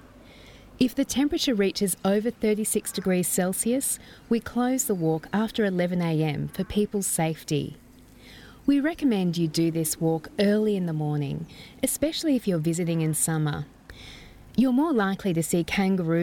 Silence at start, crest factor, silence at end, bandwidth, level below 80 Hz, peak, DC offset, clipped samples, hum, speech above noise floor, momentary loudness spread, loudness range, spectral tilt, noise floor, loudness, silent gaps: 0.3 s; 16 dB; 0 s; 18 kHz; -54 dBFS; -10 dBFS; under 0.1%; under 0.1%; none; 25 dB; 6 LU; 2 LU; -5 dB/octave; -50 dBFS; -25 LUFS; none